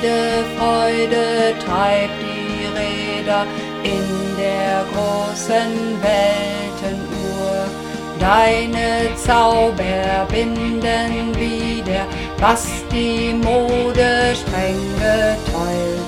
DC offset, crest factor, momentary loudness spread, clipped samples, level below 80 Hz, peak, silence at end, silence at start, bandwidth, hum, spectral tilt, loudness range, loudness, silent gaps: under 0.1%; 18 dB; 8 LU; under 0.1%; -32 dBFS; 0 dBFS; 0 s; 0 s; 16.5 kHz; none; -4.5 dB/octave; 3 LU; -18 LUFS; none